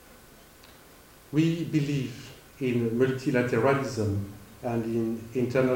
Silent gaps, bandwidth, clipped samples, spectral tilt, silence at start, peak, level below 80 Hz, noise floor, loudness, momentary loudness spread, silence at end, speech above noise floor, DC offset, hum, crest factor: none; 17 kHz; under 0.1%; -7 dB/octave; 0.1 s; -10 dBFS; -60 dBFS; -53 dBFS; -28 LUFS; 12 LU; 0 s; 26 dB; under 0.1%; none; 18 dB